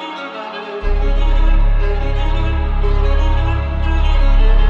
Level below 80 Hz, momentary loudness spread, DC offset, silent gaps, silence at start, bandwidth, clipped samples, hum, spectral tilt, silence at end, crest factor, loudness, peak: -14 dBFS; 9 LU; under 0.1%; none; 0 s; 4.5 kHz; under 0.1%; none; -7.5 dB/octave; 0 s; 10 dB; -19 LUFS; -2 dBFS